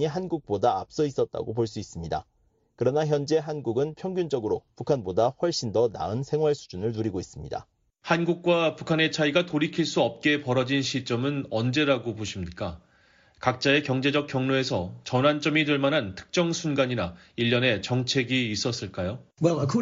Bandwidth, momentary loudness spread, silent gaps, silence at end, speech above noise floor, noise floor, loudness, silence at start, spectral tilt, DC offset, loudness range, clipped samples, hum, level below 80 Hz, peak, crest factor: 7.8 kHz; 10 LU; none; 0 s; 34 dB; -60 dBFS; -26 LUFS; 0 s; -4.5 dB/octave; under 0.1%; 3 LU; under 0.1%; none; -56 dBFS; -8 dBFS; 18 dB